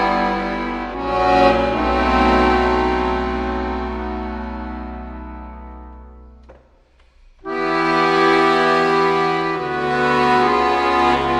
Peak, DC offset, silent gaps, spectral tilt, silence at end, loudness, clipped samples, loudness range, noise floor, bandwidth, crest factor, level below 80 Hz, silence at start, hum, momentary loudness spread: -2 dBFS; under 0.1%; none; -6 dB/octave; 0 s; -17 LUFS; under 0.1%; 15 LU; -53 dBFS; 11 kHz; 16 dB; -32 dBFS; 0 s; none; 17 LU